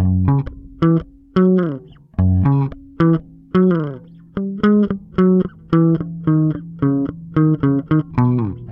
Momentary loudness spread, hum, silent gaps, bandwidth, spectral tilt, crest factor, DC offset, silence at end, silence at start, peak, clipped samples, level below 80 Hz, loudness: 10 LU; none; none; 5.6 kHz; -11.5 dB/octave; 14 dB; under 0.1%; 0 s; 0 s; -2 dBFS; under 0.1%; -40 dBFS; -17 LUFS